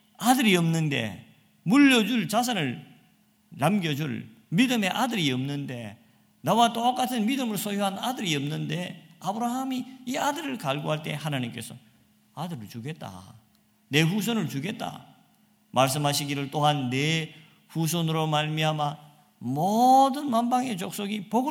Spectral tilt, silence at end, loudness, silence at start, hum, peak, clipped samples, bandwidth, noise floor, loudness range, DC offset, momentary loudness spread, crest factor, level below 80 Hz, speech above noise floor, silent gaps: -5 dB/octave; 0 s; -26 LUFS; 0.2 s; none; -6 dBFS; under 0.1%; 17.5 kHz; -63 dBFS; 6 LU; under 0.1%; 16 LU; 22 dB; -72 dBFS; 38 dB; none